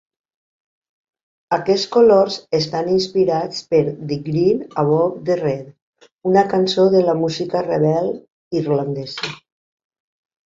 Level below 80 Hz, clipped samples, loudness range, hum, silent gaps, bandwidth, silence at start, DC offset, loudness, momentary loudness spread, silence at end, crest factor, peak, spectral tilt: -58 dBFS; under 0.1%; 2 LU; none; 5.82-5.93 s, 6.12-6.17 s, 8.32-8.51 s; 7.8 kHz; 1.5 s; under 0.1%; -18 LUFS; 11 LU; 1.1 s; 16 dB; -2 dBFS; -6.5 dB/octave